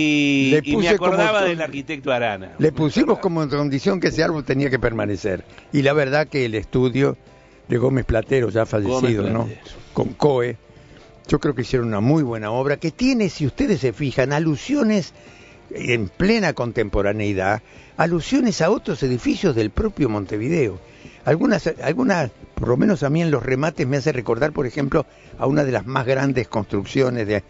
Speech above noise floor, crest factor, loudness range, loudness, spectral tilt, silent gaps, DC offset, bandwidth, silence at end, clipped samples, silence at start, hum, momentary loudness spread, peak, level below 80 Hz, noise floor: 26 dB; 18 dB; 2 LU; -20 LUFS; -6.5 dB/octave; none; under 0.1%; 8 kHz; 0.1 s; under 0.1%; 0 s; none; 7 LU; -2 dBFS; -40 dBFS; -45 dBFS